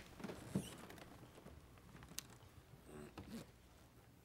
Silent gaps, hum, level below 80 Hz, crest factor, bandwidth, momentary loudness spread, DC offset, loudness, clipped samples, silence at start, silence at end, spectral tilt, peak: none; none; -70 dBFS; 34 dB; 16 kHz; 16 LU; under 0.1%; -54 LUFS; under 0.1%; 0 s; 0 s; -4.5 dB/octave; -20 dBFS